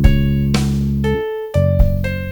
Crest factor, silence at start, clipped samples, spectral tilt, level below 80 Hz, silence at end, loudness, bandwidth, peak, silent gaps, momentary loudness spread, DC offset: 14 dB; 0 s; 0.1%; -7.5 dB/octave; -20 dBFS; 0 s; -17 LUFS; 19 kHz; 0 dBFS; none; 5 LU; under 0.1%